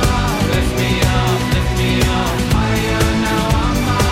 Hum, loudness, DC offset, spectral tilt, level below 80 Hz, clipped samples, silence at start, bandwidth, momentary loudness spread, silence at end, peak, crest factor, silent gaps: none; -16 LUFS; under 0.1%; -5 dB/octave; -22 dBFS; under 0.1%; 0 s; 16.5 kHz; 2 LU; 0 s; -4 dBFS; 10 dB; none